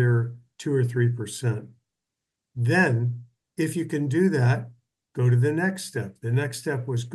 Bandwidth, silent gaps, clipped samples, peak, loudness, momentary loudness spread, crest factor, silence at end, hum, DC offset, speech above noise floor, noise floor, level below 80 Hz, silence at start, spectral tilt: 12.5 kHz; none; under 0.1%; -8 dBFS; -25 LUFS; 13 LU; 16 dB; 0 s; none; under 0.1%; 61 dB; -85 dBFS; -70 dBFS; 0 s; -7 dB/octave